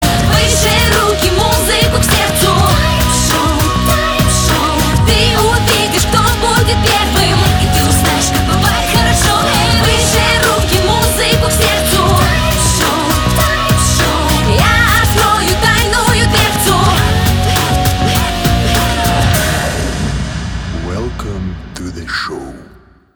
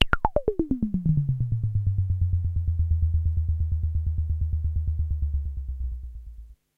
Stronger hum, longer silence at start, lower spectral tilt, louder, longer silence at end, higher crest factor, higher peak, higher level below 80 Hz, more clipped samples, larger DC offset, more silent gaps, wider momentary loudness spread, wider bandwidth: neither; about the same, 0 s vs 0 s; second, -4 dB/octave vs -8 dB/octave; first, -11 LUFS vs -27 LUFS; first, 0.55 s vs 0.25 s; second, 12 dB vs 24 dB; about the same, 0 dBFS vs 0 dBFS; first, -20 dBFS vs -30 dBFS; neither; neither; neither; about the same, 9 LU vs 9 LU; first, over 20 kHz vs 4 kHz